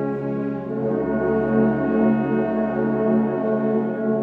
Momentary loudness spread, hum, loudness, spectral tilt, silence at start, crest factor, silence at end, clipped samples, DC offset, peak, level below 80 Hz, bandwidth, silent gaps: 6 LU; none; -21 LUFS; -11 dB/octave; 0 s; 14 dB; 0 s; under 0.1%; under 0.1%; -6 dBFS; -50 dBFS; 3.6 kHz; none